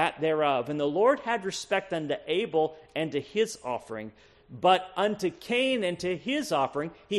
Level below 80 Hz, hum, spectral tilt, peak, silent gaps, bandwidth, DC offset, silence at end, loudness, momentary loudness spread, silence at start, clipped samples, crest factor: -66 dBFS; none; -4.5 dB/octave; -10 dBFS; none; 13 kHz; under 0.1%; 0 s; -28 LUFS; 10 LU; 0 s; under 0.1%; 20 dB